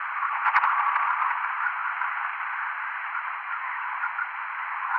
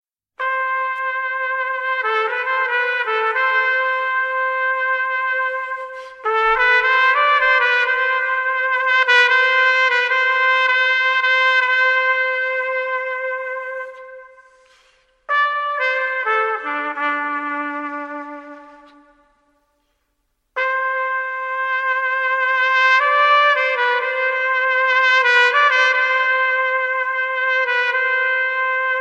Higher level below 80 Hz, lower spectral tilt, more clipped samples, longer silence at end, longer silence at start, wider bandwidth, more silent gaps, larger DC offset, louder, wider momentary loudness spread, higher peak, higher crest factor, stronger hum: second, -88 dBFS vs -60 dBFS; about the same, -0.5 dB/octave vs 0 dB/octave; neither; about the same, 0 s vs 0 s; second, 0 s vs 0.4 s; second, 6 kHz vs 8.8 kHz; neither; neither; second, -27 LUFS vs -17 LUFS; about the same, 8 LU vs 10 LU; second, -6 dBFS vs 0 dBFS; about the same, 22 dB vs 18 dB; neither